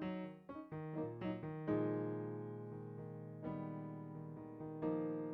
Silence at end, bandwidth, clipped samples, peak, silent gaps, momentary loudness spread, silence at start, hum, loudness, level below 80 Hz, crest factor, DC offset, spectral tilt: 0 s; 4.5 kHz; under 0.1%; -28 dBFS; none; 10 LU; 0 s; none; -45 LUFS; -74 dBFS; 16 dB; under 0.1%; -8.5 dB/octave